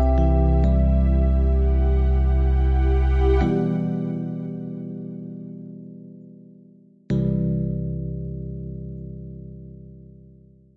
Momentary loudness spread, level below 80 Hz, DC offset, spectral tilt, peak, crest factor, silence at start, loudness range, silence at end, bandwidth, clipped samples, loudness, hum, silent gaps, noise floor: 20 LU; -24 dBFS; under 0.1%; -10.5 dB/octave; -8 dBFS; 14 dB; 0 s; 11 LU; 0.85 s; 4 kHz; under 0.1%; -22 LUFS; none; none; -51 dBFS